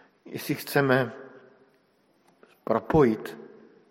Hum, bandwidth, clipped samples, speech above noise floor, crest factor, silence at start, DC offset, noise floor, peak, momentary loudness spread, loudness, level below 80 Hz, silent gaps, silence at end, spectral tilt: none; 16.5 kHz; under 0.1%; 41 dB; 22 dB; 0.25 s; under 0.1%; -66 dBFS; -6 dBFS; 20 LU; -25 LUFS; -56 dBFS; none; 0.45 s; -6.5 dB/octave